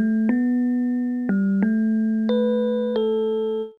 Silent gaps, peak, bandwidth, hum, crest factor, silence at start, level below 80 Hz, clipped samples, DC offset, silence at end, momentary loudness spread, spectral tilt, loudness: none; -10 dBFS; 4.6 kHz; none; 10 dB; 0 s; -66 dBFS; under 0.1%; under 0.1%; 0.1 s; 3 LU; -9.5 dB/octave; -22 LUFS